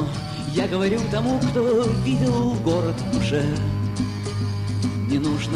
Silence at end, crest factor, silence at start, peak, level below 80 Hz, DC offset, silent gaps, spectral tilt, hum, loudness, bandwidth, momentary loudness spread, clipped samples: 0 s; 14 dB; 0 s; -8 dBFS; -40 dBFS; under 0.1%; none; -6.5 dB/octave; none; -23 LUFS; 12 kHz; 6 LU; under 0.1%